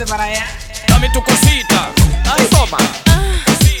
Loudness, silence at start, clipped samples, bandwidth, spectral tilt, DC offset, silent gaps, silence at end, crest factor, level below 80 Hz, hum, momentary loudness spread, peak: -12 LUFS; 0 s; under 0.1%; over 20 kHz; -4 dB/octave; under 0.1%; none; 0 s; 12 dB; -18 dBFS; none; 7 LU; 0 dBFS